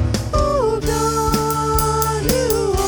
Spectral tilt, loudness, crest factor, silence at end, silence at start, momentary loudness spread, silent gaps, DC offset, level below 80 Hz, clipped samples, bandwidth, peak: -5 dB/octave; -18 LUFS; 16 dB; 0 s; 0 s; 2 LU; none; under 0.1%; -26 dBFS; under 0.1%; over 20 kHz; -2 dBFS